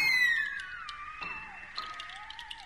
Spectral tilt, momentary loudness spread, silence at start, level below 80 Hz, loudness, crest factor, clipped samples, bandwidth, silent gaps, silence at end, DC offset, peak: 0 dB/octave; 17 LU; 0 s; -62 dBFS; -33 LUFS; 16 dB; under 0.1%; 15 kHz; none; 0 s; 0.1%; -18 dBFS